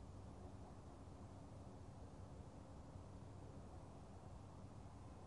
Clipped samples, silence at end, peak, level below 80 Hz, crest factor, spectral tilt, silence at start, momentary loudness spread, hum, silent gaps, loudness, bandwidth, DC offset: under 0.1%; 0 s; -44 dBFS; -64 dBFS; 14 dB; -7 dB/octave; 0 s; 1 LU; none; none; -59 LUFS; 11 kHz; under 0.1%